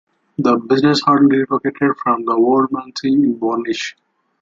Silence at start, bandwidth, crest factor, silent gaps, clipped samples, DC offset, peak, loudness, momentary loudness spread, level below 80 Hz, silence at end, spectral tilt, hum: 0.4 s; 7.6 kHz; 14 dB; none; under 0.1%; under 0.1%; -2 dBFS; -16 LUFS; 9 LU; -60 dBFS; 0.5 s; -6 dB/octave; none